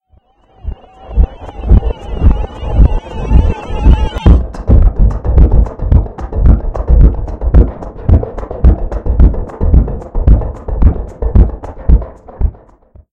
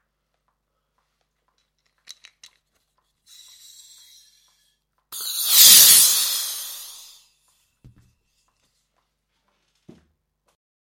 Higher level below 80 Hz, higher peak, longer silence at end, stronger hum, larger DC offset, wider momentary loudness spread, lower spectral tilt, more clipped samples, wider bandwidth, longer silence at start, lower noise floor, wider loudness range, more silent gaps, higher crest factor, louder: first, -10 dBFS vs -70 dBFS; about the same, 0 dBFS vs 0 dBFS; second, 0.6 s vs 4.1 s; second, none vs 50 Hz at -80 dBFS; neither; second, 11 LU vs 29 LU; first, -9.5 dB/octave vs 3 dB/octave; first, 3% vs under 0.1%; second, 3.6 kHz vs 17 kHz; second, 0.65 s vs 5.1 s; second, -50 dBFS vs -74 dBFS; second, 3 LU vs 16 LU; neither; second, 10 dB vs 24 dB; about the same, -13 LUFS vs -11 LUFS